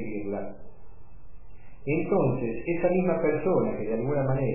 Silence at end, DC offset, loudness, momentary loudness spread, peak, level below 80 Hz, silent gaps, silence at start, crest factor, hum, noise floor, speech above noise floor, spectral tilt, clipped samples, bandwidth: 0 s; 2%; -27 LUFS; 10 LU; -12 dBFS; -50 dBFS; none; 0 s; 14 dB; none; -48 dBFS; 22 dB; -13.5 dB/octave; under 0.1%; 2.9 kHz